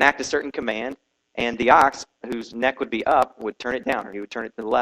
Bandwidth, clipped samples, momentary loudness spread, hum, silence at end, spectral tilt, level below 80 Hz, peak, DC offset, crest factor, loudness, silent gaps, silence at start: 13 kHz; under 0.1%; 16 LU; none; 0 s; -3.5 dB/octave; -54 dBFS; 0 dBFS; under 0.1%; 22 dB; -23 LUFS; none; 0 s